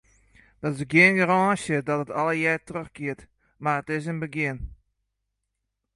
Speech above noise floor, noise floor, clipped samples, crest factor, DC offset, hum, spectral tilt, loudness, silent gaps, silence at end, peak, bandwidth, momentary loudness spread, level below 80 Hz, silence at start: 57 dB; -81 dBFS; under 0.1%; 22 dB; under 0.1%; none; -6 dB/octave; -24 LUFS; none; 1.2 s; -4 dBFS; 11.5 kHz; 16 LU; -52 dBFS; 0.6 s